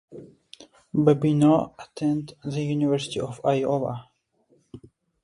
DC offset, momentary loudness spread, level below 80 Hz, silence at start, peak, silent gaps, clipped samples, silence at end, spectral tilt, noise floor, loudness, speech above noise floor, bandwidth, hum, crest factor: under 0.1%; 12 LU; -60 dBFS; 0.1 s; -6 dBFS; none; under 0.1%; 0.45 s; -7.5 dB/octave; -65 dBFS; -24 LUFS; 42 dB; 11 kHz; none; 20 dB